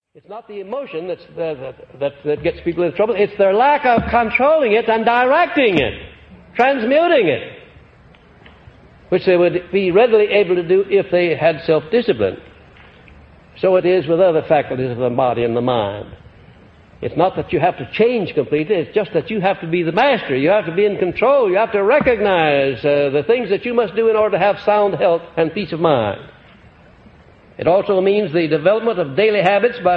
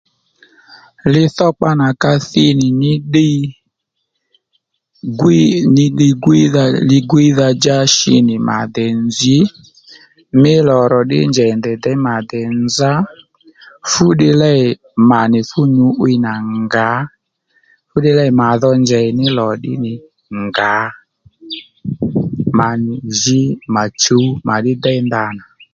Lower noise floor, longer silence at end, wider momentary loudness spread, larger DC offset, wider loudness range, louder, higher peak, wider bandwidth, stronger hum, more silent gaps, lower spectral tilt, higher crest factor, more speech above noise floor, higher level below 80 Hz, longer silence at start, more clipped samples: second, -46 dBFS vs -72 dBFS; second, 0 s vs 0.35 s; about the same, 11 LU vs 10 LU; neither; about the same, 4 LU vs 5 LU; second, -16 LUFS vs -13 LUFS; about the same, 0 dBFS vs 0 dBFS; second, 5.6 kHz vs 7.8 kHz; neither; neither; first, -8 dB/octave vs -5.5 dB/octave; about the same, 16 dB vs 14 dB; second, 31 dB vs 60 dB; about the same, -48 dBFS vs -48 dBFS; second, 0.3 s vs 1.05 s; neither